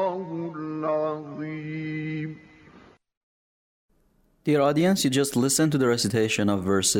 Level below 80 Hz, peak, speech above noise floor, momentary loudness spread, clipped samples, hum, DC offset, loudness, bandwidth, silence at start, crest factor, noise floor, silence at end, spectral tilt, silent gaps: -62 dBFS; -10 dBFS; 42 dB; 12 LU; under 0.1%; none; under 0.1%; -25 LUFS; 17.5 kHz; 0 s; 16 dB; -64 dBFS; 0 s; -4.5 dB/octave; 3.17-3.89 s